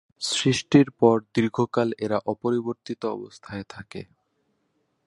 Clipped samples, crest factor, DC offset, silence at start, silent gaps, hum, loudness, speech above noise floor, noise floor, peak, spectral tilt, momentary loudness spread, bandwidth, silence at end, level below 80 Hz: under 0.1%; 22 dB; under 0.1%; 0.2 s; none; none; -23 LUFS; 48 dB; -72 dBFS; -2 dBFS; -5.5 dB/octave; 18 LU; 11.5 kHz; 1.05 s; -60 dBFS